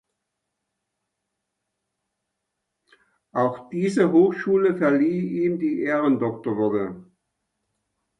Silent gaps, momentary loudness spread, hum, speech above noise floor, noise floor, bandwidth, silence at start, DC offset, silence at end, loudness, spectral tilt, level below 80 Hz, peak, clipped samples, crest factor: none; 8 LU; none; 59 dB; -81 dBFS; 11 kHz; 3.35 s; under 0.1%; 1.15 s; -22 LUFS; -8 dB/octave; -68 dBFS; -6 dBFS; under 0.1%; 18 dB